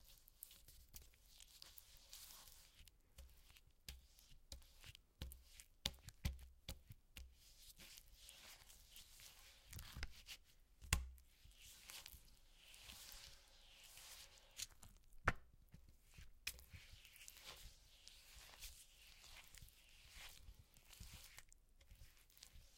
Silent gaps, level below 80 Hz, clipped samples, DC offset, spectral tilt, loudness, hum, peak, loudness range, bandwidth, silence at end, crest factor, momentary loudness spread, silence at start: none; -62 dBFS; under 0.1%; under 0.1%; -2.5 dB/octave; -55 LUFS; none; -18 dBFS; 10 LU; 16.5 kHz; 0 s; 38 dB; 18 LU; 0 s